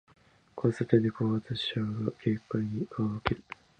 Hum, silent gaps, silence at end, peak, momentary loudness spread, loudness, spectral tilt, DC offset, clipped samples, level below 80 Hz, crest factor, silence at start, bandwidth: none; none; 0.25 s; -8 dBFS; 7 LU; -31 LUFS; -8 dB/octave; under 0.1%; under 0.1%; -56 dBFS; 24 dB; 0.55 s; 9 kHz